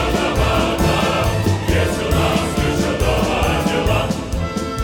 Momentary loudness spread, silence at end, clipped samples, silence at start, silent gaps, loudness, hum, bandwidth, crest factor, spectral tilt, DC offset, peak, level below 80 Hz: 4 LU; 0 s; under 0.1%; 0 s; none; -18 LUFS; none; 18.5 kHz; 14 dB; -5.5 dB/octave; under 0.1%; -4 dBFS; -26 dBFS